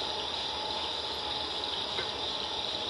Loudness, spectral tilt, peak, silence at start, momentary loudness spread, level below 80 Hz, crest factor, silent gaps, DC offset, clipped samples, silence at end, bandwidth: -32 LUFS; -2 dB/octave; -20 dBFS; 0 s; 1 LU; -58 dBFS; 14 dB; none; under 0.1%; under 0.1%; 0 s; 12 kHz